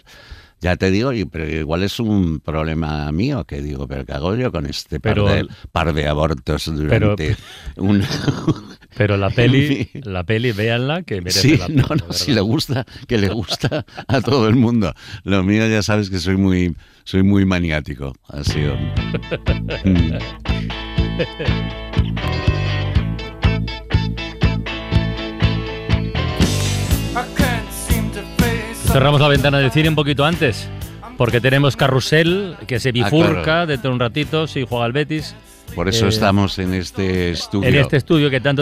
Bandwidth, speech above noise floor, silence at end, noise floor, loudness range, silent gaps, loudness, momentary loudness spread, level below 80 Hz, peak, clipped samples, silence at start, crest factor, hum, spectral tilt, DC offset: 15.5 kHz; 23 dB; 0 s; -40 dBFS; 5 LU; none; -18 LUFS; 9 LU; -30 dBFS; -4 dBFS; under 0.1%; 0.1 s; 14 dB; none; -6 dB/octave; under 0.1%